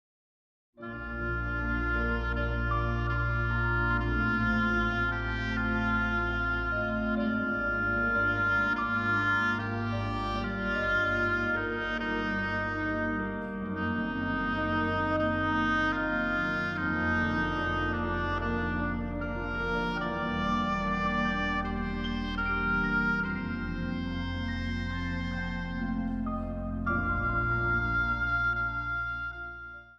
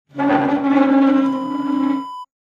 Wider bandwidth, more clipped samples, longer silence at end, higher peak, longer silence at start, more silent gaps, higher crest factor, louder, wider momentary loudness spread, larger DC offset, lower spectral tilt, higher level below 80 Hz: first, 7.4 kHz vs 5.2 kHz; neither; second, 0.05 s vs 0.25 s; second, -16 dBFS vs -4 dBFS; first, 0.8 s vs 0.15 s; neither; about the same, 14 dB vs 14 dB; second, -30 LUFS vs -17 LUFS; about the same, 7 LU vs 8 LU; neither; about the same, -7 dB/octave vs -7 dB/octave; first, -40 dBFS vs -62 dBFS